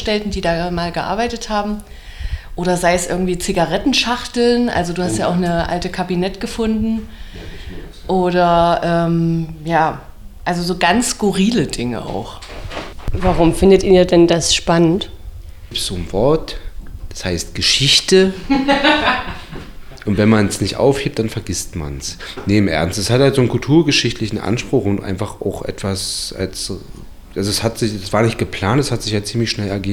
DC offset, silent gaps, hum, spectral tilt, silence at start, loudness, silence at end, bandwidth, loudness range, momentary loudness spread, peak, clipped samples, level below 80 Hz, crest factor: under 0.1%; none; none; -4.5 dB/octave; 0 s; -16 LUFS; 0 s; 18.5 kHz; 5 LU; 16 LU; -2 dBFS; under 0.1%; -32 dBFS; 16 dB